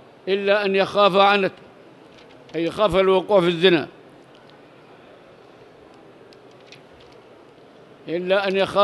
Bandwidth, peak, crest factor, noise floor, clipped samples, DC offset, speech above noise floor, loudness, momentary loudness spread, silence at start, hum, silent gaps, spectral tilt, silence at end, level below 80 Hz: 12 kHz; -2 dBFS; 20 dB; -48 dBFS; under 0.1%; under 0.1%; 29 dB; -19 LUFS; 12 LU; 0.25 s; none; none; -6 dB/octave; 0 s; -54 dBFS